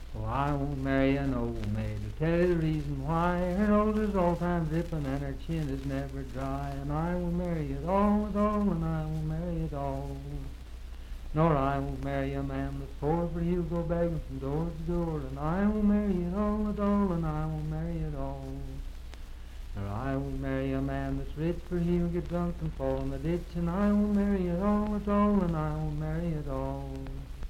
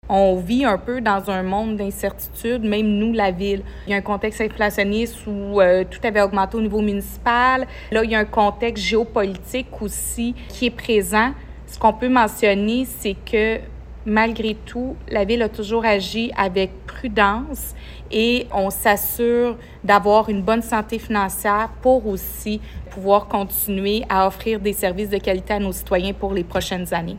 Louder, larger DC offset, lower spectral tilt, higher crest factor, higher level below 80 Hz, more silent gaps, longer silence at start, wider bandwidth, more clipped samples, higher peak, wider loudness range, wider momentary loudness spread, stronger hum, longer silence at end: second, -31 LUFS vs -20 LUFS; neither; first, -8.5 dB/octave vs -4.5 dB/octave; about the same, 18 dB vs 20 dB; about the same, -38 dBFS vs -36 dBFS; neither; about the same, 0 s vs 0.05 s; second, 14.5 kHz vs 16.5 kHz; neither; second, -12 dBFS vs 0 dBFS; about the same, 5 LU vs 3 LU; first, 12 LU vs 9 LU; neither; about the same, 0 s vs 0 s